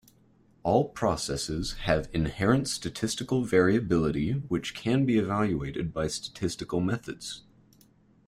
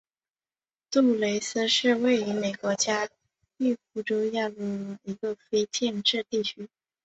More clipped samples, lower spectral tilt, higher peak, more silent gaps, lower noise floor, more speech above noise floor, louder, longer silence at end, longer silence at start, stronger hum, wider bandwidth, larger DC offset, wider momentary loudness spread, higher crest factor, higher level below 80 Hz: neither; first, -5.5 dB/octave vs -3 dB/octave; about the same, -10 dBFS vs -10 dBFS; neither; second, -62 dBFS vs under -90 dBFS; second, 34 dB vs over 63 dB; about the same, -28 LUFS vs -27 LUFS; first, 0.9 s vs 0.4 s; second, 0.65 s vs 0.9 s; neither; first, 15.5 kHz vs 8.2 kHz; neither; about the same, 9 LU vs 11 LU; about the same, 20 dB vs 18 dB; first, -48 dBFS vs -72 dBFS